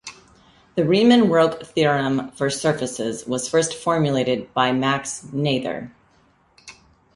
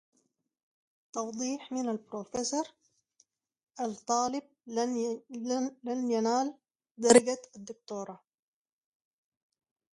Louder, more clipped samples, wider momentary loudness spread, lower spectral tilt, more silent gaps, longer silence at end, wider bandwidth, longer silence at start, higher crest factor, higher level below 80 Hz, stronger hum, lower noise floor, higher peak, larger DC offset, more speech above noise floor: first, -20 LUFS vs -31 LUFS; neither; second, 13 LU vs 17 LU; first, -5 dB/octave vs -3 dB/octave; second, none vs 3.63-3.67 s, 6.91-6.95 s; second, 0.45 s vs 1.75 s; about the same, 11.5 kHz vs 11.5 kHz; second, 0.05 s vs 1.15 s; second, 18 dB vs 28 dB; first, -58 dBFS vs -74 dBFS; neither; second, -59 dBFS vs -76 dBFS; first, -2 dBFS vs -6 dBFS; neither; second, 39 dB vs 46 dB